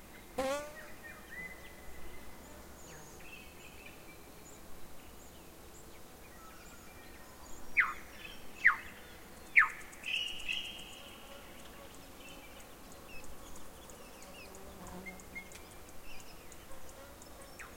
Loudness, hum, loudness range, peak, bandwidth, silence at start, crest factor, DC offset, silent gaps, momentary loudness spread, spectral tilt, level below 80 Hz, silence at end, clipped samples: -35 LUFS; none; 20 LU; -10 dBFS; 16.5 kHz; 0 s; 30 dB; under 0.1%; none; 22 LU; -2 dB/octave; -58 dBFS; 0 s; under 0.1%